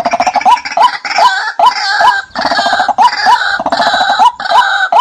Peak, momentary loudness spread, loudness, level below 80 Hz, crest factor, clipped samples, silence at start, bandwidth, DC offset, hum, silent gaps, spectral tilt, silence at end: 0 dBFS; 3 LU; -9 LUFS; -50 dBFS; 10 dB; under 0.1%; 0 s; 14.5 kHz; under 0.1%; none; none; -1 dB/octave; 0 s